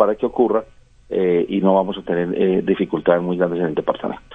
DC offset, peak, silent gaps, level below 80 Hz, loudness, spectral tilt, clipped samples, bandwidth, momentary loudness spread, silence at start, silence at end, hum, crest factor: under 0.1%; 0 dBFS; none; -50 dBFS; -19 LUFS; -9 dB/octave; under 0.1%; 3.9 kHz; 6 LU; 0 s; 0.15 s; none; 18 dB